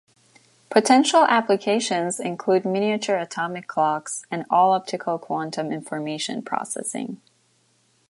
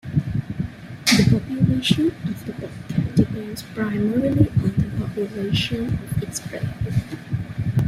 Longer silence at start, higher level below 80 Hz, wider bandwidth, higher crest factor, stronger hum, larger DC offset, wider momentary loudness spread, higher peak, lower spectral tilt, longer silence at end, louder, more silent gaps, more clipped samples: first, 0.7 s vs 0.05 s; second, -76 dBFS vs -40 dBFS; second, 12 kHz vs 15.5 kHz; about the same, 20 dB vs 20 dB; neither; neither; about the same, 12 LU vs 11 LU; about the same, -4 dBFS vs -2 dBFS; second, -3.5 dB/octave vs -5.5 dB/octave; first, 0.95 s vs 0 s; about the same, -22 LUFS vs -22 LUFS; neither; neither